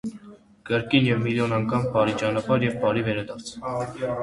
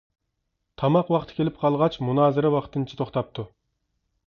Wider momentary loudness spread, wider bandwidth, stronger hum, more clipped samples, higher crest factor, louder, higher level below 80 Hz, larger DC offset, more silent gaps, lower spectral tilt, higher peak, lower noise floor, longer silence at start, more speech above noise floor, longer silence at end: about the same, 10 LU vs 11 LU; first, 11.5 kHz vs 6.8 kHz; neither; neither; about the same, 20 dB vs 18 dB; about the same, -24 LUFS vs -24 LUFS; about the same, -54 dBFS vs -56 dBFS; neither; neither; second, -6.5 dB/octave vs -9 dB/octave; about the same, -4 dBFS vs -6 dBFS; second, -47 dBFS vs -78 dBFS; second, 0.05 s vs 0.8 s; second, 24 dB vs 55 dB; second, 0 s vs 0.8 s